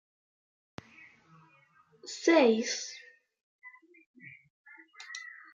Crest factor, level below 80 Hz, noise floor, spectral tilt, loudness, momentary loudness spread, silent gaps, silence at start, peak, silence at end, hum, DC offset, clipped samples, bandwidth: 22 dB; -82 dBFS; -65 dBFS; -3 dB/octave; -28 LUFS; 29 LU; 3.43-3.59 s, 4.06-4.14 s, 4.50-4.64 s; 2.05 s; -12 dBFS; 0.25 s; none; under 0.1%; under 0.1%; 7.8 kHz